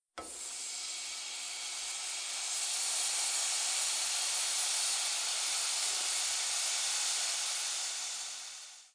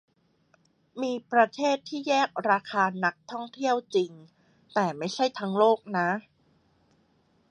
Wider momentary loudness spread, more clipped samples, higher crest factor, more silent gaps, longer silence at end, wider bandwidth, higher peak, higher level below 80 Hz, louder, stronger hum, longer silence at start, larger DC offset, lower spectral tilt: about the same, 8 LU vs 10 LU; neither; second, 16 dB vs 22 dB; neither; second, 0.05 s vs 1.3 s; about the same, 10.5 kHz vs 10 kHz; second, -20 dBFS vs -6 dBFS; about the same, -78 dBFS vs -78 dBFS; second, -32 LUFS vs -27 LUFS; neither; second, 0.15 s vs 0.95 s; neither; second, 4.5 dB/octave vs -5 dB/octave